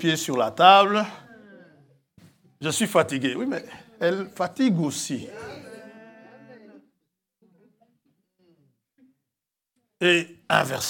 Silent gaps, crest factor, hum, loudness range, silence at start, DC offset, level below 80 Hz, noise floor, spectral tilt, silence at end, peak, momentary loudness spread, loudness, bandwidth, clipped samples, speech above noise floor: none; 24 dB; none; 13 LU; 0 s; under 0.1%; -74 dBFS; -86 dBFS; -4 dB/octave; 0 s; 0 dBFS; 23 LU; -22 LUFS; 18 kHz; under 0.1%; 64 dB